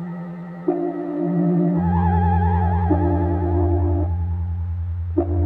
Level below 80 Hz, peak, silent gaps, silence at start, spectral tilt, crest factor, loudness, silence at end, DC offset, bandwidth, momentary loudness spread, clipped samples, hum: -30 dBFS; -6 dBFS; none; 0 s; -12.5 dB/octave; 14 dB; -21 LUFS; 0 s; under 0.1%; 3.4 kHz; 8 LU; under 0.1%; none